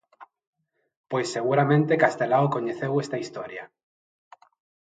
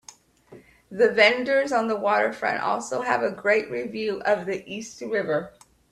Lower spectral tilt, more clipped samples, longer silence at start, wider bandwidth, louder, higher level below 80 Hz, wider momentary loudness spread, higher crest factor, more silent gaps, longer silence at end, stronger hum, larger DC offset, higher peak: first, -6.5 dB/octave vs -3.5 dB/octave; neither; second, 0.2 s vs 0.5 s; second, 9.2 kHz vs 13 kHz; about the same, -24 LUFS vs -23 LUFS; second, -74 dBFS vs -66 dBFS; about the same, 14 LU vs 13 LU; about the same, 22 dB vs 22 dB; first, 0.47-0.53 s, 0.97-1.04 s vs none; first, 1.2 s vs 0.4 s; neither; neither; about the same, -4 dBFS vs -4 dBFS